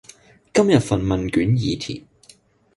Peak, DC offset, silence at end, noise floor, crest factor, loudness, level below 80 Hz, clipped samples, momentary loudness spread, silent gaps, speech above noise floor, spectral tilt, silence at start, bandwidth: -2 dBFS; under 0.1%; 0.75 s; -53 dBFS; 20 dB; -20 LUFS; -42 dBFS; under 0.1%; 12 LU; none; 34 dB; -6.5 dB/octave; 0.55 s; 11.5 kHz